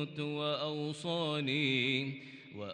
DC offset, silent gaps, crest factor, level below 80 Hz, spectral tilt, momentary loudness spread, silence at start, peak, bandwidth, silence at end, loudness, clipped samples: under 0.1%; none; 18 dB; -80 dBFS; -5.5 dB/octave; 14 LU; 0 s; -18 dBFS; 10 kHz; 0 s; -34 LUFS; under 0.1%